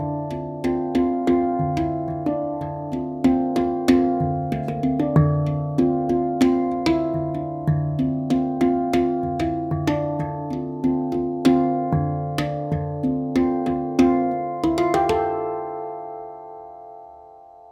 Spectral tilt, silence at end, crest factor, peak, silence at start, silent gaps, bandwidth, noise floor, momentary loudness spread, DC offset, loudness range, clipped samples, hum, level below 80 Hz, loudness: -8 dB/octave; 0.05 s; 18 dB; -4 dBFS; 0 s; none; 12.5 kHz; -45 dBFS; 10 LU; under 0.1%; 2 LU; under 0.1%; none; -46 dBFS; -22 LUFS